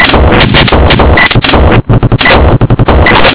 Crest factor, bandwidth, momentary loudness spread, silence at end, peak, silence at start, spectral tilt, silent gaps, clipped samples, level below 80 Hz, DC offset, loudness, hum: 4 dB; 4 kHz; 3 LU; 0 s; 0 dBFS; 0 s; -9.5 dB/octave; none; 20%; -10 dBFS; 4%; -4 LUFS; none